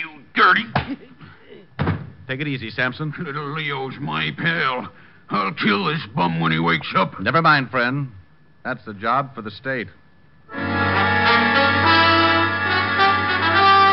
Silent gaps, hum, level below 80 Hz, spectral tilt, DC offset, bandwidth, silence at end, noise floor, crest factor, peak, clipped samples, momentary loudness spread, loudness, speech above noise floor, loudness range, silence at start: none; none; -54 dBFS; -2.5 dB/octave; 0.3%; 5.8 kHz; 0 s; -50 dBFS; 18 dB; -2 dBFS; under 0.1%; 15 LU; -19 LUFS; 28 dB; 9 LU; 0 s